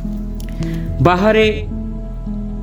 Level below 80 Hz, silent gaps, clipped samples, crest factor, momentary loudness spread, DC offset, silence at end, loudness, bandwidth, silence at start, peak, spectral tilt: -26 dBFS; none; under 0.1%; 18 dB; 15 LU; under 0.1%; 0 s; -17 LUFS; 18.5 kHz; 0 s; 0 dBFS; -7 dB/octave